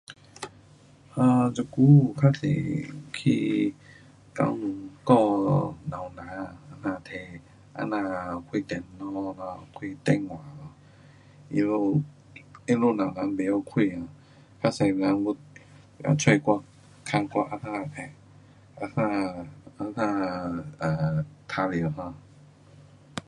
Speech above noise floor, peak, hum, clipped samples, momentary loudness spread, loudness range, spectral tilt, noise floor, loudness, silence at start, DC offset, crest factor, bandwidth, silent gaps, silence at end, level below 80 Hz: 28 dB; -6 dBFS; none; under 0.1%; 19 LU; 9 LU; -7 dB/octave; -54 dBFS; -26 LUFS; 0.1 s; under 0.1%; 22 dB; 11 kHz; none; 0.1 s; -58 dBFS